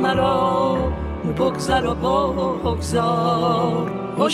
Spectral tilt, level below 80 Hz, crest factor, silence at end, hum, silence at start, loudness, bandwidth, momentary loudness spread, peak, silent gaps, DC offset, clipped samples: -6 dB/octave; -34 dBFS; 14 dB; 0 s; none; 0 s; -20 LUFS; 14 kHz; 6 LU; -6 dBFS; none; under 0.1%; under 0.1%